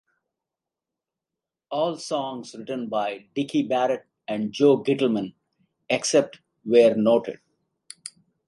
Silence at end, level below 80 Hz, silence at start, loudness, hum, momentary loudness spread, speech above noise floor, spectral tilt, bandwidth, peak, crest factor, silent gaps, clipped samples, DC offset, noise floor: 0.4 s; -72 dBFS; 1.7 s; -23 LUFS; none; 19 LU; 65 dB; -4.5 dB/octave; 11.5 kHz; -6 dBFS; 20 dB; none; under 0.1%; under 0.1%; -88 dBFS